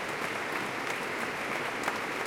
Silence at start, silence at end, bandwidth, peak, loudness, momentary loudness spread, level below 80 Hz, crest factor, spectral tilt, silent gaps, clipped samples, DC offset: 0 s; 0 s; 17 kHz; -14 dBFS; -33 LUFS; 1 LU; -66 dBFS; 20 dB; -3 dB/octave; none; under 0.1%; under 0.1%